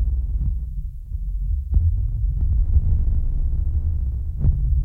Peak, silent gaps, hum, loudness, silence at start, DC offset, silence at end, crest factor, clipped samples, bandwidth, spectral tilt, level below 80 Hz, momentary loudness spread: -6 dBFS; none; none; -24 LUFS; 0 s; under 0.1%; 0 s; 14 dB; under 0.1%; 1.1 kHz; -12 dB/octave; -20 dBFS; 9 LU